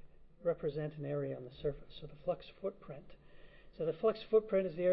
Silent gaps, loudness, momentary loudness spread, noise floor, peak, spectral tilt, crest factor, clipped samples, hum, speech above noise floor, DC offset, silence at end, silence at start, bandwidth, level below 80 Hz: none; -38 LUFS; 19 LU; -56 dBFS; -18 dBFS; -6.5 dB/octave; 18 dB; under 0.1%; none; 19 dB; under 0.1%; 0 s; 0 s; 5.6 kHz; -60 dBFS